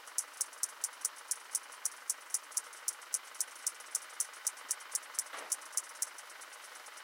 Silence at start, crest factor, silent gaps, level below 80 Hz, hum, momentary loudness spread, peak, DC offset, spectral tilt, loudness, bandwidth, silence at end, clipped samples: 0 s; 26 dB; none; under -90 dBFS; none; 4 LU; -14 dBFS; under 0.1%; 5 dB/octave; -38 LUFS; 17 kHz; 0 s; under 0.1%